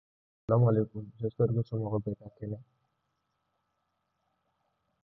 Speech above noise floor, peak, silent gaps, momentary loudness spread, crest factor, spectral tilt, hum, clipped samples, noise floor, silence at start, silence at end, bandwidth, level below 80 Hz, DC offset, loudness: 50 dB; -14 dBFS; none; 16 LU; 20 dB; -13 dB/octave; none; under 0.1%; -80 dBFS; 0.5 s; 2.4 s; 3.6 kHz; -62 dBFS; under 0.1%; -31 LUFS